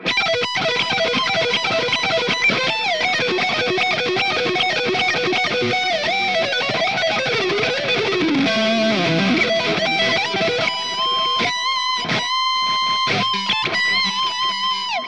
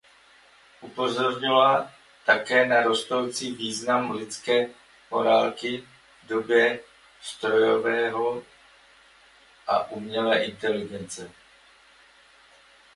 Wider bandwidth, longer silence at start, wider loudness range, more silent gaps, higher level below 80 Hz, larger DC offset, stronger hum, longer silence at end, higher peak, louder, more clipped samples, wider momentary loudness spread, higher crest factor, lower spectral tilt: about the same, 10.5 kHz vs 11.5 kHz; second, 0 s vs 0.8 s; second, 1 LU vs 6 LU; neither; first, -60 dBFS vs -68 dBFS; first, 0.4% vs under 0.1%; neither; second, 0 s vs 1.65 s; about the same, -6 dBFS vs -6 dBFS; first, -18 LUFS vs -24 LUFS; neither; second, 2 LU vs 16 LU; second, 14 dB vs 20 dB; about the same, -3 dB/octave vs -3.5 dB/octave